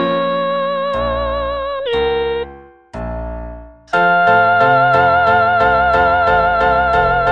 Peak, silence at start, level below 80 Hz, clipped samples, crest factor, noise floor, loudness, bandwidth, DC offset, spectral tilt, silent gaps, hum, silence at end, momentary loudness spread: 0 dBFS; 0 s; -32 dBFS; under 0.1%; 14 dB; -38 dBFS; -14 LUFS; 7.2 kHz; 0.4%; -6.5 dB/octave; none; none; 0 s; 15 LU